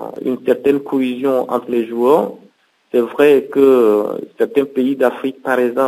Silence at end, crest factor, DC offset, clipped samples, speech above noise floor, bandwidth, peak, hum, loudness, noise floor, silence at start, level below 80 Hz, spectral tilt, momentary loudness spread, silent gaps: 0 s; 16 dB; under 0.1%; under 0.1%; 30 dB; 16 kHz; 0 dBFS; none; -16 LUFS; -44 dBFS; 0 s; -66 dBFS; -6.5 dB/octave; 8 LU; none